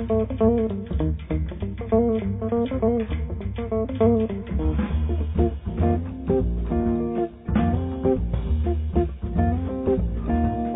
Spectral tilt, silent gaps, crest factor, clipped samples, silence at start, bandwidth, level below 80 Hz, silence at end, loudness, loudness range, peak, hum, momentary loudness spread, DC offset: -13 dB/octave; none; 16 dB; under 0.1%; 0 s; 3.9 kHz; -30 dBFS; 0 s; -24 LUFS; 1 LU; -6 dBFS; none; 6 LU; under 0.1%